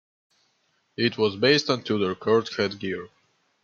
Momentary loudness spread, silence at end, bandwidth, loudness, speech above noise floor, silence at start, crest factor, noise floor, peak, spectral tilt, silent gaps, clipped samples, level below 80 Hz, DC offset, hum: 12 LU; 0.6 s; 7.4 kHz; -24 LUFS; 46 dB; 1 s; 18 dB; -70 dBFS; -8 dBFS; -5 dB/octave; none; under 0.1%; -68 dBFS; under 0.1%; none